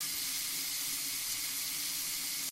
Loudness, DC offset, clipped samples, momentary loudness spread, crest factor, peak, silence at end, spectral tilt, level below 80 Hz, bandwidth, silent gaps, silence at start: -33 LUFS; under 0.1%; under 0.1%; 0 LU; 14 dB; -22 dBFS; 0 s; 1.5 dB/octave; -68 dBFS; 16 kHz; none; 0 s